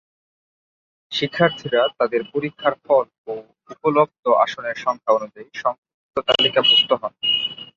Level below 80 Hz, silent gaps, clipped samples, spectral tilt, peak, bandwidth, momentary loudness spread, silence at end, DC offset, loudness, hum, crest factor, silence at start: -64 dBFS; 3.18-3.24 s, 4.19-4.23 s, 5.78-5.83 s, 5.94-6.09 s; under 0.1%; -4.5 dB/octave; -2 dBFS; 7.4 kHz; 14 LU; 0.1 s; under 0.1%; -19 LUFS; none; 20 dB; 1.1 s